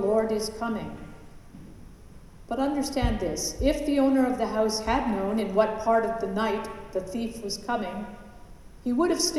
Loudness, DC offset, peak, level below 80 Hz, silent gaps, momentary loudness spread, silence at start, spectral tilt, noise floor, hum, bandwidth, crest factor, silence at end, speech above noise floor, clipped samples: -27 LUFS; under 0.1%; -10 dBFS; -42 dBFS; none; 13 LU; 0 s; -4.5 dB/octave; -47 dBFS; none; 14 kHz; 18 dB; 0 s; 21 dB; under 0.1%